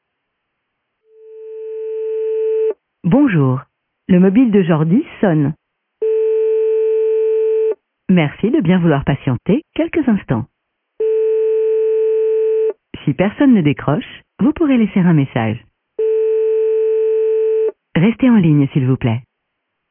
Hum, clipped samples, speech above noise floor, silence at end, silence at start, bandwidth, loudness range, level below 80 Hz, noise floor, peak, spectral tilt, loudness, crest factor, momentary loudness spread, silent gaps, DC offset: none; under 0.1%; 60 dB; 0.7 s; 1.3 s; 3.6 kHz; 2 LU; -48 dBFS; -73 dBFS; -2 dBFS; -12.5 dB/octave; -15 LUFS; 14 dB; 10 LU; none; under 0.1%